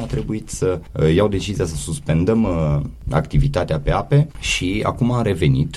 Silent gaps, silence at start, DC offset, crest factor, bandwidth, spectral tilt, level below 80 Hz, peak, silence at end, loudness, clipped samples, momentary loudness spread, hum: none; 0 s; under 0.1%; 16 dB; 12.5 kHz; -6 dB/octave; -30 dBFS; -4 dBFS; 0 s; -19 LUFS; under 0.1%; 6 LU; none